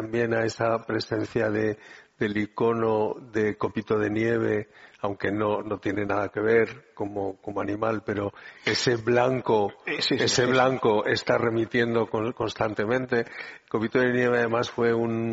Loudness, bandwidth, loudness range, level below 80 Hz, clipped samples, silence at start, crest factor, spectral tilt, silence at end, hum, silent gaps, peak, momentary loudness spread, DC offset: -26 LUFS; 8 kHz; 4 LU; -60 dBFS; under 0.1%; 0 s; 20 dB; -4 dB/octave; 0 s; none; none; -6 dBFS; 9 LU; under 0.1%